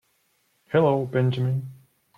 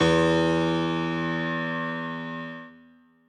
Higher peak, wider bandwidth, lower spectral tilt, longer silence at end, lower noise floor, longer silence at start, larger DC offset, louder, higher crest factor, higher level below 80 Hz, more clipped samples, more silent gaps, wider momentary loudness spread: about the same, -8 dBFS vs -10 dBFS; second, 4.8 kHz vs 9.4 kHz; first, -9 dB/octave vs -6 dB/octave; about the same, 0.45 s vs 0.55 s; first, -68 dBFS vs -56 dBFS; first, 0.7 s vs 0 s; neither; about the same, -24 LUFS vs -26 LUFS; about the same, 16 dB vs 16 dB; second, -62 dBFS vs -52 dBFS; neither; neither; second, 9 LU vs 14 LU